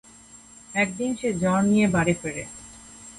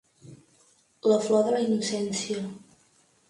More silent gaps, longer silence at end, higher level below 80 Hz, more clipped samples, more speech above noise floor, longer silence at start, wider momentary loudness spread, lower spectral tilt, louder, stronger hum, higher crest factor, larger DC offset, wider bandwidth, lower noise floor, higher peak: neither; second, 0 s vs 0.7 s; first, -52 dBFS vs -72 dBFS; neither; second, 26 dB vs 38 dB; about the same, 0.35 s vs 0.25 s; first, 21 LU vs 12 LU; about the same, -5.5 dB/octave vs -4.5 dB/octave; first, -23 LUFS vs -26 LUFS; neither; about the same, 18 dB vs 18 dB; neither; about the same, 11.5 kHz vs 11.5 kHz; second, -49 dBFS vs -64 dBFS; about the same, -8 dBFS vs -10 dBFS